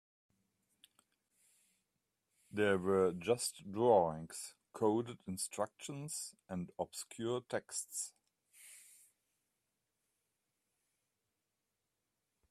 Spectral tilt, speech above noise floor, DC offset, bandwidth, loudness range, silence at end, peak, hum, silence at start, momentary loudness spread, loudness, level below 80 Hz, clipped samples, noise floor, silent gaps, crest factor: -4.5 dB/octave; 51 dB; under 0.1%; 15 kHz; 10 LU; 3.7 s; -18 dBFS; none; 2.55 s; 15 LU; -38 LUFS; -80 dBFS; under 0.1%; -88 dBFS; none; 24 dB